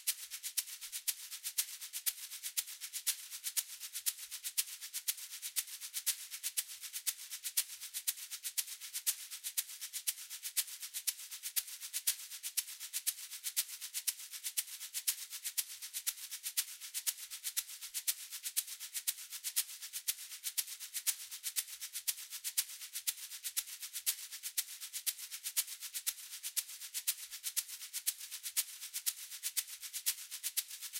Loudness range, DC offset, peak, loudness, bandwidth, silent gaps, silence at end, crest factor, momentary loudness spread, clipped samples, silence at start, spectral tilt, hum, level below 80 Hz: 1 LU; under 0.1%; -14 dBFS; -38 LUFS; 17 kHz; none; 0 s; 26 dB; 5 LU; under 0.1%; 0 s; 7 dB/octave; none; under -90 dBFS